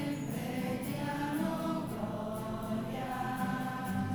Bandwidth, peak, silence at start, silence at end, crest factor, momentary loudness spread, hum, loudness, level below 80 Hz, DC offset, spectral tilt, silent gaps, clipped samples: over 20 kHz; -22 dBFS; 0 s; 0 s; 14 dB; 4 LU; none; -36 LUFS; -56 dBFS; under 0.1%; -6.5 dB/octave; none; under 0.1%